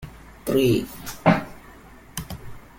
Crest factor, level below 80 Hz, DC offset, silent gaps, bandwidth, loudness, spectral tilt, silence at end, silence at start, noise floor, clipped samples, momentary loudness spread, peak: 20 dB; -46 dBFS; under 0.1%; none; 17 kHz; -23 LUFS; -6 dB/octave; 0.2 s; 0 s; -46 dBFS; under 0.1%; 19 LU; -4 dBFS